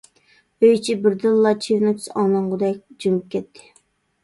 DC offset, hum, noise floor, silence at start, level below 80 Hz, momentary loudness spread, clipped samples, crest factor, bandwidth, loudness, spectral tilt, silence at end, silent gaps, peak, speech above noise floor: under 0.1%; none; -61 dBFS; 0.6 s; -66 dBFS; 8 LU; under 0.1%; 16 dB; 11.5 kHz; -20 LUFS; -6 dB/octave; 0.8 s; none; -4 dBFS; 42 dB